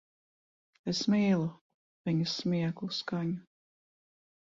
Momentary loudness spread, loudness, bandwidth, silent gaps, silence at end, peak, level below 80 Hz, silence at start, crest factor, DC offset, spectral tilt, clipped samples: 12 LU; -32 LUFS; 7.6 kHz; 1.61-2.05 s; 1 s; -16 dBFS; -72 dBFS; 0.85 s; 16 dB; under 0.1%; -6 dB/octave; under 0.1%